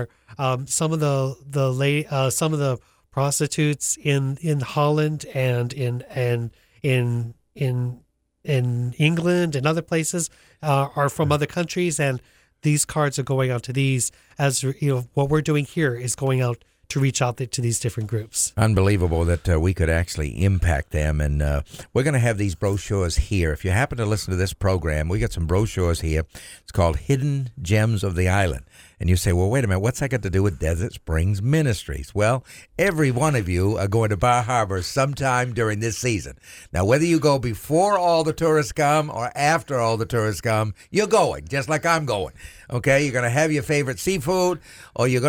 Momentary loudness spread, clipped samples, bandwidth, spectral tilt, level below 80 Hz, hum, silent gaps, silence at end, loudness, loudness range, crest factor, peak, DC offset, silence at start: 7 LU; under 0.1%; 17 kHz; -5.5 dB/octave; -36 dBFS; none; none; 0 s; -22 LUFS; 2 LU; 18 dB; -4 dBFS; under 0.1%; 0 s